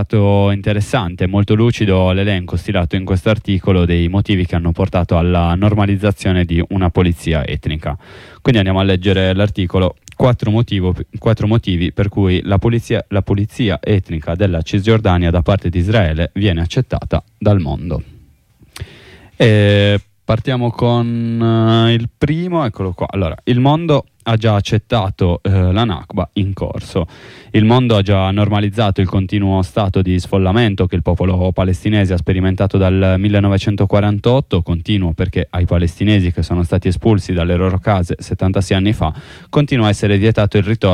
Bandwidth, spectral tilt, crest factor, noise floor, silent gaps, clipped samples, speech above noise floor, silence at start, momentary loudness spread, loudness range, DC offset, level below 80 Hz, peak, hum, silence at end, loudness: 11 kHz; -7.5 dB/octave; 12 dB; -49 dBFS; none; under 0.1%; 35 dB; 0 s; 6 LU; 2 LU; under 0.1%; -30 dBFS; -2 dBFS; none; 0 s; -15 LUFS